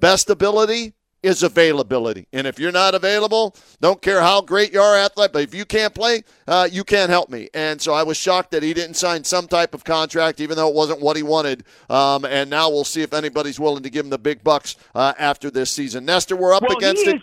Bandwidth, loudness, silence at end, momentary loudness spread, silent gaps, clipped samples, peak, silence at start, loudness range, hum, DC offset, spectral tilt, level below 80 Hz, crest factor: 16 kHz; -18 LUFS; 0 s; 8 LU; none; under 0.1%; -2 dBFS; 0 s; 4 LU; none; under 0.1%; -3 dB/octave; -52 dBFS; 16 dB